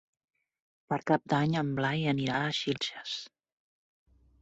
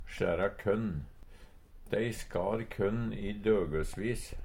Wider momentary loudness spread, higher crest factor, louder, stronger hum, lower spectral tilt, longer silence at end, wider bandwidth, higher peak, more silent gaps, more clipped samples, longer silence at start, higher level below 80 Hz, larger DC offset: first, 10 LU vs 7 LU; about the same, 22 dB vs 18 dB; first, -31 LUFS vs -34 LUFS; neither; about the same, -5.5 dB/octave vs -6.5 dB/octave; first, 1.15 s vs 0 s; second, 8.2 kHz vs 16.5 kHz; first, -12 dBFS vs -16 dBFS; neither; neither; first, 0.9 s vs 0 s; second, -68 dBFS vs -46 dBFS; neither